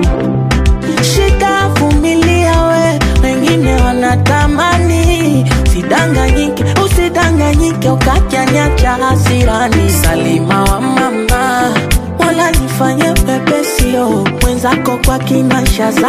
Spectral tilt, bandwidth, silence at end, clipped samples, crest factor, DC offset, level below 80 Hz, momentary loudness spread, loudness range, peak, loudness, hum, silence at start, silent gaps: -5.5 dB/octave; 15.5 kHz; 0 s; under 0.1%; 10 dB; under 0.1%; -16 dBFS; 2 LU; 1 LU; 0 dBFS; -11 LUFS; none; 0 s; none